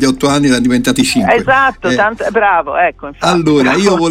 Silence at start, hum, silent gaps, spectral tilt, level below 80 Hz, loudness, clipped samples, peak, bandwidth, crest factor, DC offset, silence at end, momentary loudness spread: 0 s; none; none; -4.5 dB/octave; -38 dBFS; -11 LUFS; under 0.1%; 0 dBFS; 16 kHz; 12 dB; under 0.1%; 0 s; 4 LU